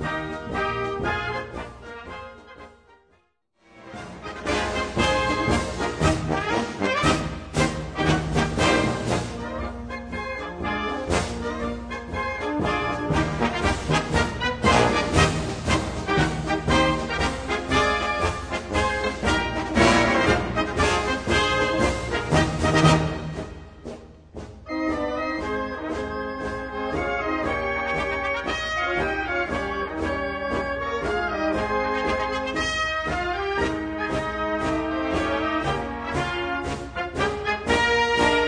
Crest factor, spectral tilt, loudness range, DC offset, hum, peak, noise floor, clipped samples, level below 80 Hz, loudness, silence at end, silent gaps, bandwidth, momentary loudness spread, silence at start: 22 dB; -5 dB/octave; 7 LU; under 0.1%; none; -2 dBFS; -66 dBFS; under 0.1%; -38 dBFS; -24 LUFS; 0 s; none; 10.5 kHz; 11 LU; 0 s